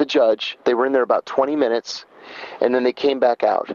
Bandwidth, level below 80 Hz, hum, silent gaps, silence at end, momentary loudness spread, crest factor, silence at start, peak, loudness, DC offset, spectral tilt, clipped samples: 7.4 kHz; -70 dBFS; none; none; 0 s; 15 LU; 16 dB; 0 s; -4 dBFS; -19 LUFS; under 0.1%; -4 dB/octave; under 0.1%